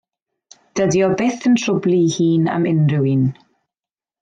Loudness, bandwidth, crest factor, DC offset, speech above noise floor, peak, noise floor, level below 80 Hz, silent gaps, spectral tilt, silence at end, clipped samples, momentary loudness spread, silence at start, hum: -17 LUFS; 9 kHz; 12 dB; under 0.1%; over 74 dB; -6 dBFS; under -90 dBFS; -58 dBFS; none; -6.5 dB/octave; 0.9 s; under 0.1%; 4 LU; 0.75 s; none